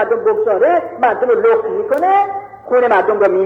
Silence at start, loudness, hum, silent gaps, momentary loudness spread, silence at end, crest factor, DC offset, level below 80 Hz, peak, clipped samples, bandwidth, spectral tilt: 0 s; -14 LUFS; none; none; 5 LU; 0 s; 12 dB; under 0.1%; -58 dBFS; -2 dBFS; under 0.1%; 5.8 kHz; -6.5 dB/octave